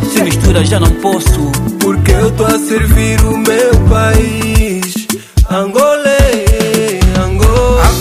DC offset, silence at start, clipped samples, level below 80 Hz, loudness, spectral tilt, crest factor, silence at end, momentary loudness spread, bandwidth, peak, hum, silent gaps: under 0.1%; 0 s; 0.4%; -14 dBFS; -10 LUFS; -5.5 dB/octave; 10 dB; 0 s; 4 LU; 16 kHz; 0 dBFS; none; none